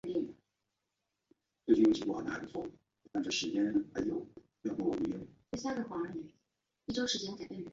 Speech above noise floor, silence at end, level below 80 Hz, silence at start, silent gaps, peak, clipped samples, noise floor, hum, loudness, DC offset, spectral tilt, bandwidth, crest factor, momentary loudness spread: 50 dB; 0 s; -68 dBFS; 0.05 s; none; -14 dBFS; under 0.1%; -86 dBFS; none; -35 LUFS; under 0.1%; -4.5 dB/octave; 7.8 kHz; 22 dB; 15 LU